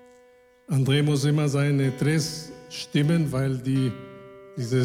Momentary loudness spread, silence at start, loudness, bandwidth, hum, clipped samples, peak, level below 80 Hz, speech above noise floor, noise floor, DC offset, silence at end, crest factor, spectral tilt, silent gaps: 15 LU; 0.7 s; -24 LUFS; 15 kHz; none; under 0.1%; -8 dBFS; -58 dBFS; 33 dB; -56 dBFS; under 0.1%; 0 s; 16 dB; -6 dB/octave; none